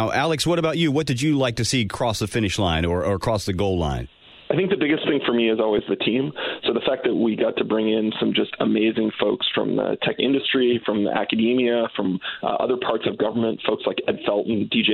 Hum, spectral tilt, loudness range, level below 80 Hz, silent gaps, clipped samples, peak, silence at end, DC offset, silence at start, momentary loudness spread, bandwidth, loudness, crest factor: none; -5 dB/octave; 2 LU; -44 dBFS; none; under 0.1%; -4 dBFS; 0 s; under 0.1%; 0 s; 4 LU; 15 kHz; -22 LUFS; 18 dB